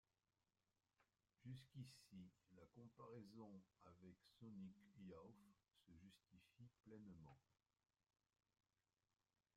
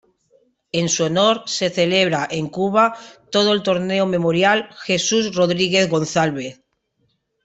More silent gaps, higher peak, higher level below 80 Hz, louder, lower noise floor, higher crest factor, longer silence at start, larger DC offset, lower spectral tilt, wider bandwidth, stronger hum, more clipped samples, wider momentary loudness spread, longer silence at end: neither; second, -48 dBFS vs -2 dBFS; second, -90 dBFS vs -60 dBFS; second, -64 LUFS vs -18 LUFS; first, under -90 dBFS vs -68 dBFS; about the same, 18 dB vs 18 dB; first, 1 s vs 0.75 s; neither; first, -7 dB/octave vs -4 dB/octave; first, 12 kHz vs 8.4 kHz; neither; neither; about the same, 8 LU vs 6 LU; first, 2 s vs 0.9 s